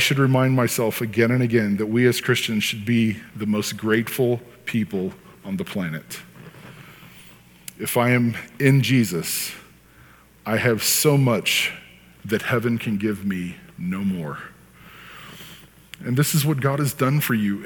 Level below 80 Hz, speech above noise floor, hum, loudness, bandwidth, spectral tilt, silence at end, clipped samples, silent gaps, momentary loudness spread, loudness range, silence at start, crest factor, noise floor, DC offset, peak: -60 dBFS; 29 dB; none; -21 LUFS; 19 kHz; -5 dB/octave; 0 s; under 0.1%; none; 21 LU; 8 LU; 0 s; 18 dB; -50 dBFS; under 0.1%; -4 dBFS